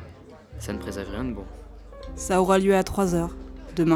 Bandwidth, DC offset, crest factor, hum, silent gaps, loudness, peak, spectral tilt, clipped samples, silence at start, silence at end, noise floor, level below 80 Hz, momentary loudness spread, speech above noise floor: 17 kHz; under 0.1%; 18 dB; none; none; -25 LUFS; -6 dBFS; -6 dB/octave; under 0.1%; 0 s; 0 s; -46 dBFS; -40 dBFS; 24 LU; 21 dB